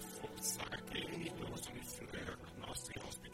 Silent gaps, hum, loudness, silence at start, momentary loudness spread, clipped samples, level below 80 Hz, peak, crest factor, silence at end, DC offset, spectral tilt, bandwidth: none; none; -45 LUFS; 0 s; 8 LU; under 0.1%; -62 dBFS; -26 dBFS; 20 dB; 0 s; under 0.1%; -3 dB/octave; 16 kHz